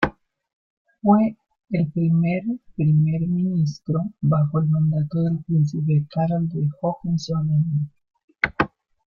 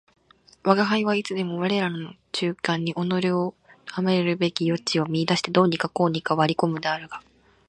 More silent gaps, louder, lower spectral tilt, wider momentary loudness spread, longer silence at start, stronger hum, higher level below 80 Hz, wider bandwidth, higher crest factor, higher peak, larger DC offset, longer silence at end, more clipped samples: first, 0.53-0.85 s, 8.24-8.28 s vs none; about the same, -22 LUFS vs -24 LUFS; first, -8.5 dB/octave vs -5.5 dB/octave; second, 7 LU vs 10 LU; second, 0 s vs 0.65 s; neither; first, -52 dBFS vs -66 dBFS; second, 7 kHz vs 10.5 kHz; about the same, 20 dB vs 22 dB; about the same, -2 dBFS vs -2 dBFS; neither; about the same, 0.4 s vs 0.5 s; neither